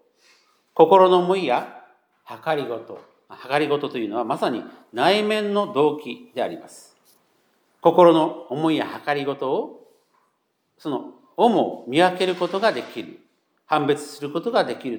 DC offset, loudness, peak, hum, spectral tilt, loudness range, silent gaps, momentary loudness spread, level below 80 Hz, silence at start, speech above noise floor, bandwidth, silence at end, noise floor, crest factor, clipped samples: under 0.1%; -21 LUFS; -2 dBFS; none; -5.5 dB/octave; 5 LU; none; 19 LU; -82 dBFS; 0.75 s; 50 dB; 19.5 kHz; 0 s; -71 dBFS; 20 dB; under 0.1%